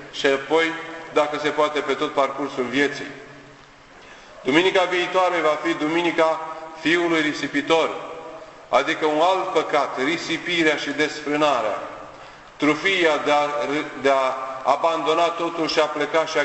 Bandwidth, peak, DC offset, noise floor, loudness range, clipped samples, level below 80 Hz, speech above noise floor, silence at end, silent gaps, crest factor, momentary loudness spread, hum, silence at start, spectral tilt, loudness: 8.4 kHz; -2 dBFS; under 0.1%; -47 dBFS; 3 LU; under 0.1%; -60 dBFS; 26 dB; 0 s; none; 20 dB; 11 LU; none; 0 s; -3.5 dB/octave; -21 LUFS